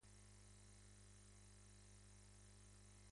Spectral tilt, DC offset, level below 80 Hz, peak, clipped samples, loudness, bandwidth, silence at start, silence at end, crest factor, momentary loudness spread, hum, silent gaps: -3.5 dB/octave; under 0.1%; -70 dBFS; -54 dBFS; under 0.1%; -66 LUFS; 11.5 kHz; 0 s; 0 s; 12 dB; 0 LU; 50 Hz at -65 dBFS; none